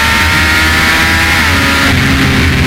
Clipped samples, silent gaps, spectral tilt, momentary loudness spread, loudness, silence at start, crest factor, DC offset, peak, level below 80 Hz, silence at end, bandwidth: 0.1%; none; -3.5 dB/octave; 1 LU; -8 LUFS; 0 s; 8 dB; under 0.1%; 0 dBFS; -20 dBFS; 0 s; 16.5 kHz